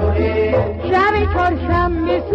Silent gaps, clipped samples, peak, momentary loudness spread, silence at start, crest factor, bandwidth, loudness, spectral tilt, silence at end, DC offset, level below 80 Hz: none; under 0.1%; -6 dBFS; 3 LU; 0 s; 10 dB; 6.2 kHz; -17 LUFS; -8.5 dB/octave; 0 s; under 0.1%; -26 dBFS